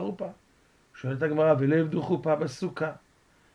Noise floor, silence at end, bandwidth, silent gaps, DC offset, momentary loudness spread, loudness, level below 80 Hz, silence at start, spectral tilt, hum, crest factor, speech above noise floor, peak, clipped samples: -63 dBFS; 0.6 s; 10.5 kHz; none; under 0.1%; 14 LU; -27 LUFS; -66 dBFS; 0 s; -8 dB/octave; none; 18 dB; 36 dB; -10 dBFS; under 0.1%